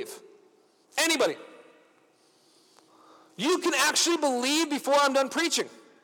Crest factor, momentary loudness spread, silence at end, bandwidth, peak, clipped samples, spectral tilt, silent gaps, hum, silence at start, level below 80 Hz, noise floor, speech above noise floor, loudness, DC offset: 18 dB; 14 LU; 0.3 s; over 20 kHz; -12 dBFS; under 0.1%; -1 dB/octave; none; none; 0 s; -86 dBFS; -63 dBFS; 38 dB; -25 LUFS; under 0.1%